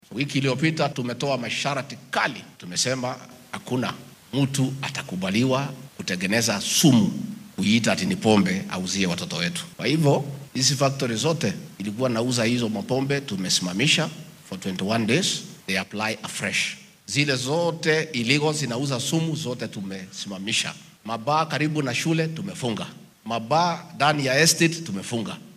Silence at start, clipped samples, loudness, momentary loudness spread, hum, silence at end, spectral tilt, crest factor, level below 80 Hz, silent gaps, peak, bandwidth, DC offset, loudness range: 0.1 s; under 0.1%; -24 LUFS; 12 LU; none; 0 s; -4 dB/octave; 22 dB; -66 dBFS; none; -4 dBFS; 15.5 kHz; under 0.1%; 5 LU